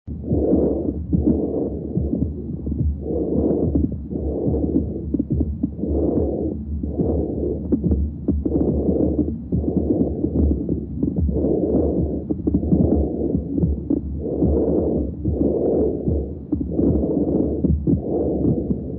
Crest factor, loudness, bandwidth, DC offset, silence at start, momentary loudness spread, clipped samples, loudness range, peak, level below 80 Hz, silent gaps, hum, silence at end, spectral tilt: 16 dB; -22 LUFS; 1.5 kHz; under 0.1%; 0.05 s; 6 LU; under 0.1%; 2 LU; -4 dBFS; -28 dBFS; none; none; 0 s; -16.5 dB/octave